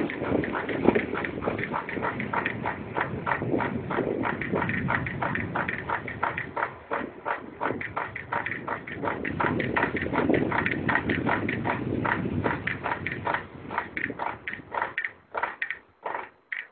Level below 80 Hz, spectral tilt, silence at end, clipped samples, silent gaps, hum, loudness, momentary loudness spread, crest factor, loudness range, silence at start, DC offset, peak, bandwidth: -50 dBFS; -10.5 dB/octave; 0.05 s; under 0.1%; none; none; -29 LUFS; 8 LU; 26 dB; 5 LU; 0 s; under 0.1%; -4 dBFS; 4.5 kHz